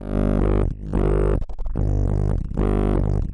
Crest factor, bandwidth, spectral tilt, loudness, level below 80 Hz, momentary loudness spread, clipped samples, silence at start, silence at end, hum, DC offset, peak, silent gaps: 10 dB; 3.8 kHz; -10 dB/octave; -23 LUFS; -24 dBFS; 5 LU; under 0.1%; 0 s; 0 s; none; 0.2%; -10 dBFS; none